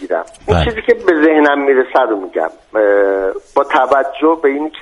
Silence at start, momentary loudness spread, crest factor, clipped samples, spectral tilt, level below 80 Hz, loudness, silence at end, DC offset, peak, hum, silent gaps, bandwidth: 0 s; 8 LU; 14 dB; under 0.1%; -7 dB/octave; -34 dBFS; -13 LUFS; 0 s; under 0.1%; 0 dBFS; none; none; 10.5 kHz